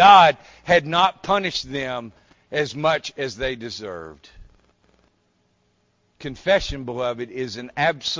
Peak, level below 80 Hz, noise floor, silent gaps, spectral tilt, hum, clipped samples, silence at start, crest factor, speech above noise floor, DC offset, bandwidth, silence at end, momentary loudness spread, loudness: -2 dBFS; -48 dBFS; -66 dBFS; none; -4 dB/octave; none; under 0.1%; 0 s; 20 dB; 45 dB; under 0.1%; 7.6 kHz; 0 s; 16 LU; -21 LUFS